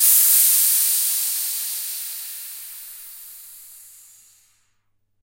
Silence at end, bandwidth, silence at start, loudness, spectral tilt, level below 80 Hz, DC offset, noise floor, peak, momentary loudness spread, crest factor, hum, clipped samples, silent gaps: 1.45 s; 16.5 kHz; 0 s; -16 LUFS; 5.5 dB/octave; -76 dBFS; under 0.1%; -67 dBFS; -2 dBFS; 25 LU; 20 dB; none; under 0.1%; none